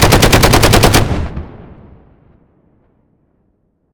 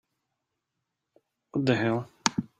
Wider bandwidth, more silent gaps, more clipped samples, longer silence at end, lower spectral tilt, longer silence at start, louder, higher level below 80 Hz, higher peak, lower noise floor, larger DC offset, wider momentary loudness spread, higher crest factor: first, over 20 kHz vs 15.5 kHz; neither; first, 0.5% vs under 0.1%; first, 2.35 s vs 0.15 s; about the same, -4 dB/octave vs -4.5 dB/octave; second, 0 s vs 1.55 s; first, -9 LUFS vs -28 LUFS; first, -22 dBFS vs -68 dBFS; about the same, 0 dBFS vs 0 dBFS; second, -60 dBFS vs -84 dBFS; neither; first, 19 LU vs 5 LU; second, 14 dB vs 32 dB